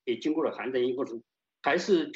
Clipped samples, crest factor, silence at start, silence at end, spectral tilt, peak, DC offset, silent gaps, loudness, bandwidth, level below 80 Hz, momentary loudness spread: under 0.1%; 16 dB; 0.05 s; 0 s; -5 dB/octave; -12 dBFS; under 0.1%; none; -29 LUFS; 7.8 kHz; -76 dBFS; 10 LU